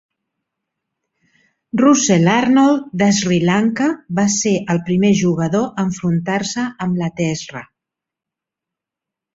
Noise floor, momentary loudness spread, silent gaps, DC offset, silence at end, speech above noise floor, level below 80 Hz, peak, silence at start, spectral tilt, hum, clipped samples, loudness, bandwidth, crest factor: -85 dBFS; 9 LU; none; under 0.1%; 1.7 s; 70 dB; -54 dBFS; -2 dBFS; 1.75 s; -5 dB/octave; none; under 0.1%; -16 LUFS; 7.8 kHz; 16 dB